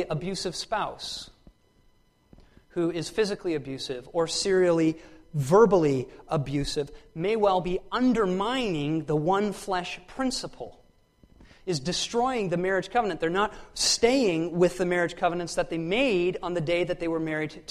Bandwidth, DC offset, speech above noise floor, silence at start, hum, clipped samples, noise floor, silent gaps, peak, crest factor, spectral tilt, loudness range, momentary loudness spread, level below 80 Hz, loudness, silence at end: 13.5 kHz; under 0.1%; 36 dB; 0 s; none; under 0.1%; -62 dBFS; none; -8 dBFS; 20 dB; -4.5 dB/octave; 6 LU; 11 LU; -50 dBFS; -26 LUFS; 0.1 s